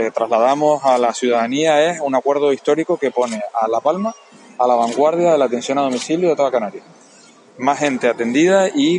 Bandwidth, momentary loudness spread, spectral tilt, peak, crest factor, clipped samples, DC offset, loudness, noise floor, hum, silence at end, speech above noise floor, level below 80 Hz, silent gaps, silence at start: 10.5 kHz; 6 LU; -4.5 dB/octave; -2 dBFS; 16 dB; under 0.1%; under 0.1%; -17 LUFS; -46 dBFS; none; 0 s; 30 dB; -72 dBFS; none; 0 s